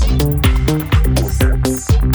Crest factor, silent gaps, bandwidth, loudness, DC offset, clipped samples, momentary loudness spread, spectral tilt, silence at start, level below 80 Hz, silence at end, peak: 12 dB; none; over 20 kHz; -15 LUFS; under 0.1%; under 0.1%; 2 LU; -6 dB/octave; 0 s; -16 dBFS; 0 s; -2 dBFS